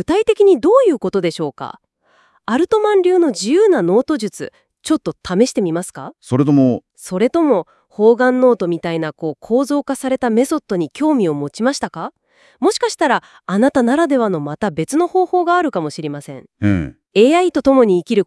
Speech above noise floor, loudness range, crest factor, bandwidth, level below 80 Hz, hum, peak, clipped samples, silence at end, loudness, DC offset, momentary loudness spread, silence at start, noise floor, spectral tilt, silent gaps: 41 dB; 3 LU; 16 dB; 12 kHz; -52 dBFS; none; 0 dBFS; under 0.1%; 0 s; -16 LUFS; under 0.1%; 13 LU; 0 s; -56 dBFS; -6 dB/octave; none